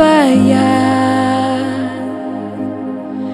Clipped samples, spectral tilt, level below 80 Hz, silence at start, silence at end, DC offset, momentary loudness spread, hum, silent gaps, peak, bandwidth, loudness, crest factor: under 0.1%; -6 dB/octave; -58 dBFS; 0 s; 0 s; under 0.1%; 13 LU; none; none; 0 dBFS; 11.5 kHz; -14 LUFS; 14 dB